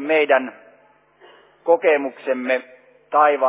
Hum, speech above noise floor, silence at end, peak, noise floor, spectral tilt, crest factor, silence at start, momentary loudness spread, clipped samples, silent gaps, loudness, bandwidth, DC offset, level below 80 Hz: none; 37 dB; 0 s; -4 dBFS; -55 dBFS; -7 dB/octave; 18 dB; 0 s; 8 LU; under 0.1%; none; -19 LUFS; 4 kHz; under 0.1%; -84 dBFS